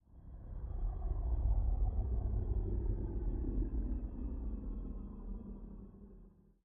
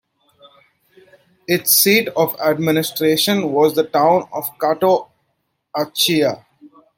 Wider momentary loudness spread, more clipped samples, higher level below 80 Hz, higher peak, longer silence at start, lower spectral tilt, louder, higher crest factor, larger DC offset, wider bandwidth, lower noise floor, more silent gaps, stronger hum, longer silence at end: first, 17 LU vs 11 LU; neither; first, -38 dBFS vs -64 dBFS; second, -24 dBFS vs -2 dBFS; second, 0.1 s vs 1.5 s; first, -13 dB/octave vs -3.5 dB/octave; second, -41 LUFS vs -16 LUFS; about the same, 14 dB vs 18 dB; neither; second, 1.8 kHz vs 17 kHz; second, -60 dBFS vs -70 dBFS; neither; neither; about the same, 0.35 s vs 0.3 s